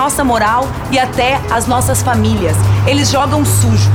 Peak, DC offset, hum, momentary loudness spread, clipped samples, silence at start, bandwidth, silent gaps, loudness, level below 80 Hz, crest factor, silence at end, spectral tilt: 0 dBFS; under 0.1%; none; 3 LU; under 0.1%; 0 s; 17.5 kHz; none; -12 LUFS; -28 dBFS; 12 dB; 0 s; -5 dB/octave